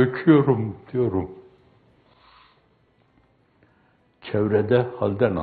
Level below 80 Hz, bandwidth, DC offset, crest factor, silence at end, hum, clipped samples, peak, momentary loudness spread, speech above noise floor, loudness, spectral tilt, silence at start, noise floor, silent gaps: -58 dBFS; 4.7 kHz; under 0.1%; 20 dB; 0 s; none; under 0.1%; -4 dBFS; 12 LU; 41 dB; -22 LUFS; -12 dB/octave; 0 s; -62 dBFS; none